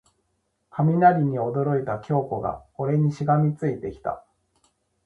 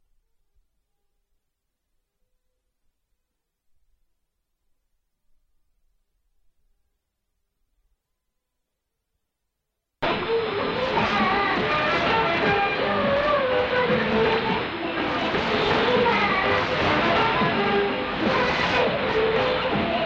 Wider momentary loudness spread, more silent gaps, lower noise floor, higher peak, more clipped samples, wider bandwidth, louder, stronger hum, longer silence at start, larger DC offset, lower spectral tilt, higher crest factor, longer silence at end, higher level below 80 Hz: first, 14 LU vs 5 LU; neither; second, -73 dBFS vs -80 dBFS; first, -4 dBFS vs -10 dBFS; neither; second, 6.6 kHz vs 8 kHz; about the same, -24 LUFS vs -22 LUFS; neither; second, 0.75 s vs 10 s; neither; first, -10 dB/octave vs -5.5 dB/octave; about the same, 20 dB vs 16 dB; first, 0.85 s vs 0 s; second, -56 dBFS vs -48 dBFS